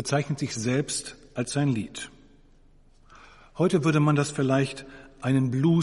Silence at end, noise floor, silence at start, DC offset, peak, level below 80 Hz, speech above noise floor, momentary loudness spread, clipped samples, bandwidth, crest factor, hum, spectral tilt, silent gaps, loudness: 0 s; -56 dBFS; 0 s; under 0.1%; -8 dBFS; -56 dBFS; 31 dB; 16 LU; under 0.1%; 11.5 kHz; 18 dB; none; -6 dB/octave; none; -26 LUFS